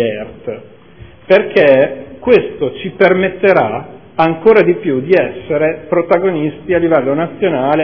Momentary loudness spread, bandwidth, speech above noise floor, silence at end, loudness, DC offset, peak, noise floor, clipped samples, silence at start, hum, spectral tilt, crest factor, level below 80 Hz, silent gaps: 12 LU; 5.4 kHz; 26 dB; 0 s; -13 LUFS; 0.6%; 0 dBFS; -38 dBFS; 0.4%; 0 s; none; -9 dB/octave; 12 dB; -48 dBFS; none